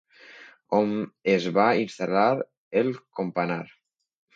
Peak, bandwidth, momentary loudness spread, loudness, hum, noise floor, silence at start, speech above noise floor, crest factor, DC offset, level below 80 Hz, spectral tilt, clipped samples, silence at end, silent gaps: -6 dBFS; 7.8 kHz; 9 LU; -25 LUFS; none; -50 dBFS; 0.3 s; 25 dB; 20 dB; under 0.1%; -72 dBFS; -6.5 dB/octave; under 0.1%; 0.7 s; 2.57-2.71 s